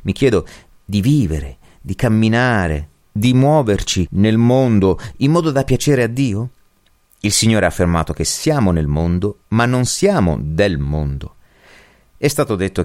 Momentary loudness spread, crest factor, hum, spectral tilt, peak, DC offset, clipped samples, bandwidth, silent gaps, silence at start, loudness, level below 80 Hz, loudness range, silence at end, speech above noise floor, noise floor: 10 LU; 14 dB; none; -5.5 dB/octave; -2 dBFS; under 0.1%; under 0.1%; 16.5 kHz; none; 0 s; -16 LUFS; -32 dBFS; 3 LU; 0 s; 40 dB; -56 dBFS